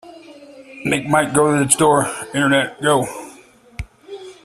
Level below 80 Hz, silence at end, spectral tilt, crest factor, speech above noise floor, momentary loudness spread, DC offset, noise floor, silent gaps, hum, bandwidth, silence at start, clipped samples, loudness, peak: -46 dBFS; 0.1 s; -4 dB/octave; 20 dB; 29 dB; 21 LU; under 0.1%; -46 dBFS; none; none; 15 kHz; 0.05 s; under 0.1%; -17 LUFS; 0 dBFS